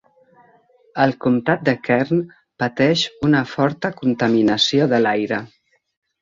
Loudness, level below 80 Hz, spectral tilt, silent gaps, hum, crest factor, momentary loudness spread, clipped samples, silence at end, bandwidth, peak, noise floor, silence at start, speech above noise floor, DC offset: -18 LUFS; -56 dBFS; -5.5 dB/octave; none; none; 18 dB; 9 LU; under 0.1%; 0.75 s; 7.6 kHz; -2 dBFS; -55 dBFS; 0.95 s; 37 dB; under 0.1%